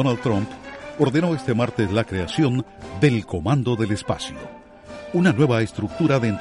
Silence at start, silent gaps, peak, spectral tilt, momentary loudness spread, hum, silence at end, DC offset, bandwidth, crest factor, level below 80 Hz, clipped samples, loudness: 0 s; none; -4 dBFS; -7 dB/octave; 15 LU; none; 0 s; under 0.1%; 11.5 kHz; 18 dB; -48 dBFS; under 0.1%; -22 LUFS